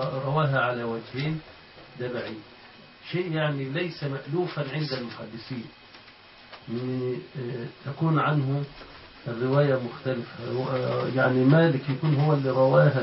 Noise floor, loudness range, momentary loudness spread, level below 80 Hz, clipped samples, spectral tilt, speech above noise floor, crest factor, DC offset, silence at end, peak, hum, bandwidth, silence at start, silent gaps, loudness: -50 dBFS; 9 LU; 17 LU; -62 dBFS; under 0.1%; -11.5 dB/octave; 25 dB; 20 dB; under 0.1%; 0 s; -6 dBFS; none; 5.8 kHz; 0 s; none; -26 LUFS